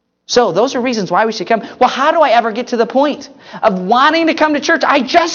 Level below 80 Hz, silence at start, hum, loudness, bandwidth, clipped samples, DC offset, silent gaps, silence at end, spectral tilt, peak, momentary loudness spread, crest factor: -56 dBFS; 0.3 s; none; -13 LUFS; 7.4 kHz; under 0.1%; under 0.1%; none; 0 s; -4 dB/octave; 0 dBFS; 6 LU; 14 dB